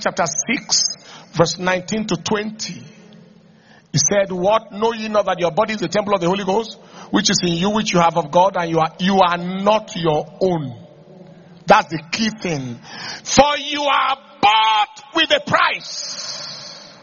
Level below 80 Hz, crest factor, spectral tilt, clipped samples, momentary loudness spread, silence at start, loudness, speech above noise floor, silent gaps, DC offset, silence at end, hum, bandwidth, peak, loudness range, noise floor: -50 dBFS; 18 dB; -3 dB/octave; under 0.1%; 13 LU; 0 s; -18 LUFS; 31 dB; none; under 0.1%; 0.1 s; none; 7.4 kHz; 0 dBFS; 4 LU; -49 dBFS